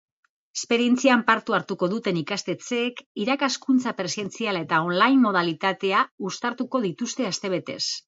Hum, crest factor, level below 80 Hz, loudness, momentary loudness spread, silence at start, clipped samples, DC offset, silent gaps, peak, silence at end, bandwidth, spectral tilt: none; 20 dB; -74 dBFS; -24 LUFS; 10 LU; 0.55 s; under 0.1%; under 0.1%; 3.06-3.15 s, 6.11-6.18 s; -4 dBFS; 0.2 s; 8 kHz; -4 dB/octave